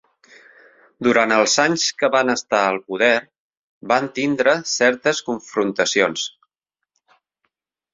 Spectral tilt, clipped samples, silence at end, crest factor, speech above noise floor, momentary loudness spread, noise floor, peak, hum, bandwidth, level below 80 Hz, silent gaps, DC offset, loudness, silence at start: -2.5 dB/octave; under 0.1%; 1.65 s; 20 dB; 64 dB; 7 LU; -83 dBFS; 0 dBFS; none; 7.8 kHz; -66 dBFS; 3.39-3.50 s, 3.57-3.81 s; under 0.1%; -18 LUFS; 1 s